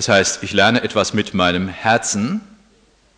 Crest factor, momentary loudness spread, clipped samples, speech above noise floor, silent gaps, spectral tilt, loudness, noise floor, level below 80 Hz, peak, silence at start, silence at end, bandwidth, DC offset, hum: 16 dB; 6 LU; under 0.1%; 38 dB; none; -3.5 dB/octave; -17 LUFS; -55 dBFS; -52 dBFS; -2 dBFS; 0 s; 0.75 s; 10.5 kHz; under 0.1%; none